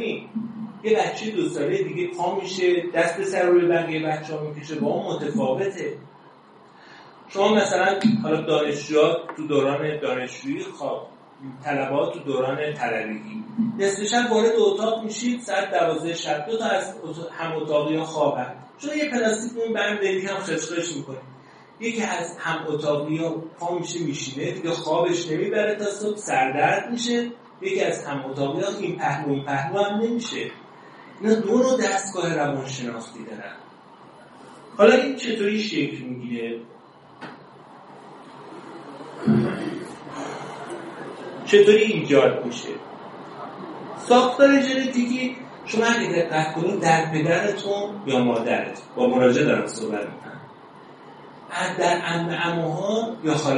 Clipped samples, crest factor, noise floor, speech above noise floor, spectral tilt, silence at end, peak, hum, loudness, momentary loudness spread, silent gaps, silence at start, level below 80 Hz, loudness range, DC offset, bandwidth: under 0.1%; 22 dB; -50 dBFS; 27 dB; -5 dB/octave; 0 s; -2 dBFS; none; -23 LUFS; 17 LU; none; 0 s; -70 dBFS; 6 LU; under 0.1%; 11 kHz